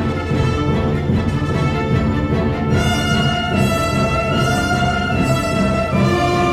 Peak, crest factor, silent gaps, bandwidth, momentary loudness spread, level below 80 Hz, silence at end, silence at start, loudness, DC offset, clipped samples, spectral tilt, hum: -2 dBFS; 14 dB; none; 14 kHz; 2 LU; -30 dBFS; 0 s; 0 s; -17 LUFS; under 0.1%; under 0.1%; -6 dB/octave; none